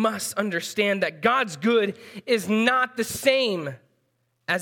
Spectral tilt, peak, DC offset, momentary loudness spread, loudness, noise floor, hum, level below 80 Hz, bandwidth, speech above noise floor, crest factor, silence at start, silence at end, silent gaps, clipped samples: -3.5 dB/octave; -4 dBFS; under 0.1%; 9 LU; -23 LUFS; -71 dBFS; none; -70 dBFS; 18 kHz; 48 dB; 20 dB; 0 s; 0 s; none; under 0.1%